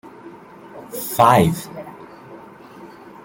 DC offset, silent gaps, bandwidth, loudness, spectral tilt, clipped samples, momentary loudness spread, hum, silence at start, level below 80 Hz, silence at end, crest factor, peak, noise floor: under 0.1%; none; 17 kHz; -17 LUFS; -5.5 dB/octave; under 0.1%; 27 LU; none; 0.05 s; -52 dBFS; 0.4 s; 22 dB; 0 dBFS; -41 dBFS